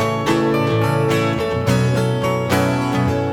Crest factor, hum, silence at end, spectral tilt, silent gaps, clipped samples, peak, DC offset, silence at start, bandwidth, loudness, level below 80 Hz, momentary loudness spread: 14 dB; none; 0 s; -6.5 dB/octave; none; under 0.1%; -4 dBFS; under 0.1%; 0 s; 17.5 kHz; -18 LUFS; -42 dBFS; 2 LU